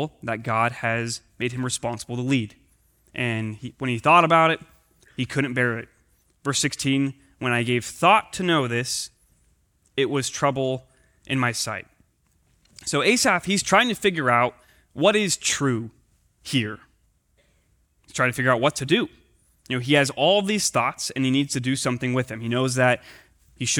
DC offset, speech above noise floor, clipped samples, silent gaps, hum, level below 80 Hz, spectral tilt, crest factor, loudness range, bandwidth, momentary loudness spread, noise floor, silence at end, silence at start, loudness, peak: under 0.1%; 42 dB; under 0.1%; none; none; -60 dBFS; -4 dB/octave; 20 dB; 5 LU; 20 kHz; 12 LU; -65 dBFS; 0 s; 0 s; -23 LUFS; -4 dBFS